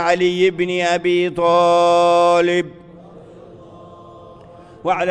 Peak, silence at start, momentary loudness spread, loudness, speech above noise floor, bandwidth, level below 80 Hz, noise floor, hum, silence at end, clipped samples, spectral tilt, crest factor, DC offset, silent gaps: -2 dBFS; 0 s; 8 LU; -16 LUFS; 26 dB; 9.6 kHz; -56 dBFS; -41 dBFS; none; 0 s; under 0.1%; -5 dB/octave; 16 dB; under 0.1%; none